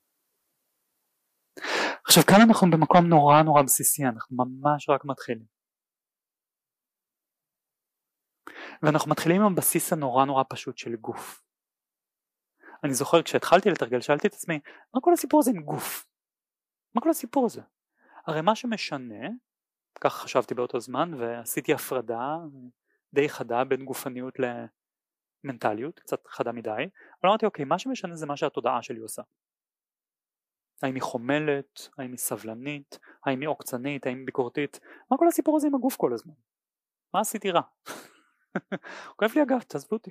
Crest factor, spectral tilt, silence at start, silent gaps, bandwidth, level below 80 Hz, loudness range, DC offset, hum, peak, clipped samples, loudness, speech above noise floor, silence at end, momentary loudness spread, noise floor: 22 dB; -4.5 dB/octave; 1.6 s; none; 15.5 kHz; -70 dBFS; 12 LU; under 0.1%; none; -4 dBFS; under 0.1%; -25 LUFS; over 65 dB; 0 s; 18 LU; under -90 dBFS